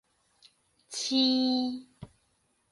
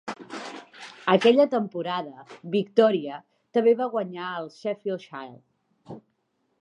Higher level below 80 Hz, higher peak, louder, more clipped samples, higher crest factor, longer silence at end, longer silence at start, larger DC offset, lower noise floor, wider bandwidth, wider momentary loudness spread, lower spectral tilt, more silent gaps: first, -70 dBFS vs -80 dBFS; second, -14 dBFS vs -4 dBFS; second, -28 LUFS vs -24 LUFS; neither; about the same, 18 dB vs 22 dB; about the same, 0.65 s vs 0.6 s; first, 0.9 s vs 0.05 s; neither; about the same, -73 dBFS vs -73 dBFS; first, 11.5 kHz vs 9.6 kHz; second, 15 LU vs 23 LU; second, -3 dB/octave vs -6 dB/octave; neither